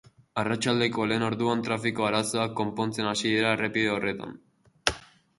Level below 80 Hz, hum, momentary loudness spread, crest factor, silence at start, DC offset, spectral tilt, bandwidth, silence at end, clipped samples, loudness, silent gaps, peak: -58 dBFS; none; 7 LU; 26 dB; 0.35 s; under 0.1%; -4.5 dB/octave; 11.5 kHz; 0.35 s; under 0.1%; -27 LUFS; none; -2 dBFS